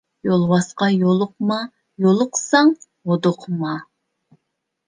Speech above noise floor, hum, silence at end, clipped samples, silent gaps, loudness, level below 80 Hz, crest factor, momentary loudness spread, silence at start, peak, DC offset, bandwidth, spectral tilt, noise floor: 59 dB; none; 1.05 s; under 0.1%; none; -19 LUFS; -66 dBFS; 18 dB; 11 LU; 0.25 s; -2 dBFS; under 0.1%; 10 kHz; -5.5 dB/octave; -76 dBFS